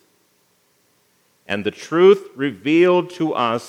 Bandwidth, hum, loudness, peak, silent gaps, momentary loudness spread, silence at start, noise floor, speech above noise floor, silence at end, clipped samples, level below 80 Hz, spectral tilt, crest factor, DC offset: 10.5 kHz; none; -18 LUFS; -2 dBFS; none; 11 LU; 1.5 s; -62 dBFS; 45 dB; 0 s; under 0.1%; -76 dBFS; -6 dB/octave; 18 dB; under 0.1%